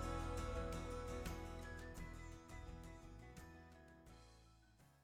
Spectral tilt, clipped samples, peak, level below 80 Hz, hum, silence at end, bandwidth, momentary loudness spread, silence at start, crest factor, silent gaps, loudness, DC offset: -5.5 dB/octave; under 0.1%; -34 dBFS; -54 dBFS; none; 0 s; 17 kHz; 18 LU; 0 s; 16 dB; none; -51 LUFS; under 0.1%